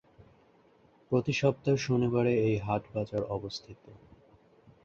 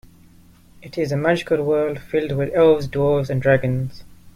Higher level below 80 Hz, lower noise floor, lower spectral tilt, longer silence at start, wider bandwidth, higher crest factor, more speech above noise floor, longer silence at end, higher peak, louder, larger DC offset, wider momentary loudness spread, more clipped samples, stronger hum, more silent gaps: second, -60 dBFS vs -48 dBFS; first, -63 dBFS vs -49 dBFS; about the same, -6.5 dB/octave vs -7.5 dB/octave; first, 1.1 s vs 0.8 s; second, 7.6 kHz vs 15 kHz; about the same, 20 dB vs 16 dB; about the same, 33 dB vs 30 dB; first, 0.9 s vs 0.05 s; second, -12 dBFS vs -4 dBFS; second, -30 LUFS vs -20 LUFS; neither; about the same, 9 LU vs 10 LU; neither; neither; neither